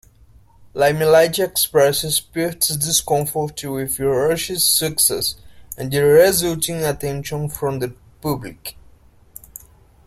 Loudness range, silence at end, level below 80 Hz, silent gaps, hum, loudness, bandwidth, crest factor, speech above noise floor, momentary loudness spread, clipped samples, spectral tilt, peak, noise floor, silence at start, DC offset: 7 LU; 1.35 s; -46 dBFS; none; none; -18 LUFS; 16.5 kHz; 18 dB; 31 dB; 16 LU; under 0.1%; -3 dB/octave; -2 dBFS; -49 dBFS; 0.6 s; under 0.1%